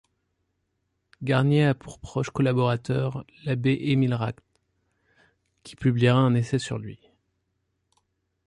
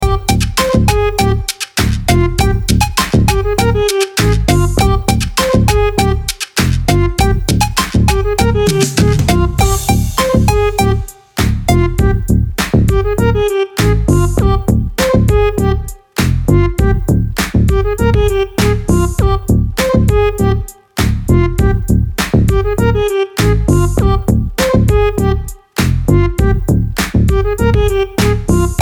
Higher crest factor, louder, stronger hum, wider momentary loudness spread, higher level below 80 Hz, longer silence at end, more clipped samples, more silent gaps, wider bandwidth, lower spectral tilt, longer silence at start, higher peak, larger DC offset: first, 18 dB vs 12 dB; second, -25 LUFS vs -13 LUFS; neither; first, 13 LU vs 4 LU; second, -56 dBFS vs -18 dBFS; first, 1.5 s vs 0 s; neither; neither; second, 11 kHz vs over 20 kHz; first, -7.5 dB/octave vs -5.5 dB/octave; first, 1.2 s vs 0 s; second, -8 dBFS vs 0 dBFS; neither